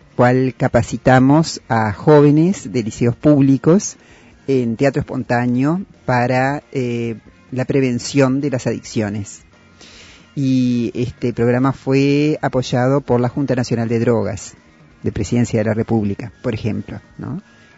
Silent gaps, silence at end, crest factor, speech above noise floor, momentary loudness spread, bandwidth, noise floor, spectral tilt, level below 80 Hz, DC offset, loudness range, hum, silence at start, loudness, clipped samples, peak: none; 0.4 s; 16 dB; 27 dB; 14 LU; 8 kHz; -44 dBFS; -7 dB/octave; -46 dBFS; under 0.1%; 6 LU; none; 0.2 s; -17 LUFS; under 0.1%; 0 dBFS